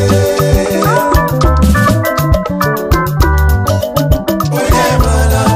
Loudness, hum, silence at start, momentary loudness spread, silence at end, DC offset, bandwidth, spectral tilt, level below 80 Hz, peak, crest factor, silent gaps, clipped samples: -11 LUFS; none; 0 s; 4 LU; 0 s; under 0.1%; 16 kHz; -6 dB/octave; -16 dBFS; 0 dBFS; 10 dB; none; under 0.1%